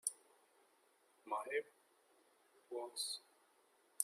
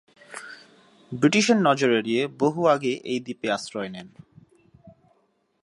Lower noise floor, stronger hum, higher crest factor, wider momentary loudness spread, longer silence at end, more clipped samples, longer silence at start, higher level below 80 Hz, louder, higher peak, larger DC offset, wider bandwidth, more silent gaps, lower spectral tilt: first, -75 dBFS vs -68 dBFS; neither; first, 32 dB vs 20 dB; about the same, 20 LU vs 20 LU; second, 0 s vs 0.75 s; neither; second, 0.05 s vs 0.3 s; second, under -90 dBFS vs -68 dBFS; second, -45 LUFS vs -23 LUFS; second, -18 dBFS vs -6 dBFS; neither; first, 15.5 kHz vs 11.5 kHz; neither; second, 1.5 dB/octave vs -4.5 dB/octave